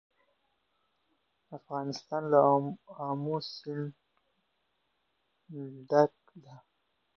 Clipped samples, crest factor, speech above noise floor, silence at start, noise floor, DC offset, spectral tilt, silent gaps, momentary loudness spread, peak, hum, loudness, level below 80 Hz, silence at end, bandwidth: under 0.1%; 24 dB; 48 dB; 1.5 s; -78 dBFS; under 0.1%; -7 dB/octave; none; 19 LU; -10 dBFS; none; -30 LUFS; -82 dBFS; 0.65 s; 6.8 kHz